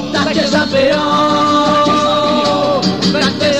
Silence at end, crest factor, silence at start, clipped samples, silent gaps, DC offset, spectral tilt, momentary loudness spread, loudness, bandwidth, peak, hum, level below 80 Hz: 0 s; 12 dB; 0 s; under 0.1%; none; 0.7%; -4.5 dB/octave; 2 LU; -12 LUFS; 13.5 kHz; -2 dBFS; none; -44 dBFS